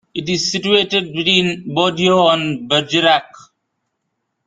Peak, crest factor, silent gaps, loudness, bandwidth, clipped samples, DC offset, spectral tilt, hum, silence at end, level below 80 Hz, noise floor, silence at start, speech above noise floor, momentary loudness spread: 0 dBFS; 18 dB; none; -15 LUFS; 9.4 kHz; under 0.1%; under 0.1%; -4 dB/octave; none; 1.05 s; -56 dBFS; -73 dBFS; 0.15 s; 57 dB; 5 LU